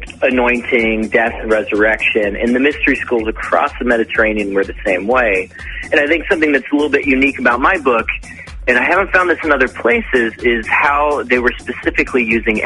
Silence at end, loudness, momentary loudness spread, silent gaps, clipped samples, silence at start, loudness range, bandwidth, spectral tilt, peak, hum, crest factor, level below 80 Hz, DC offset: 0 s; -14 LUFS; 6 LU; none; under 0.1%; 0 s; 1 LU; 11.5 kHz; -5.5 dB/octave; 0 dBFS; none; 14 dB; -34 dBFS; under 0.1%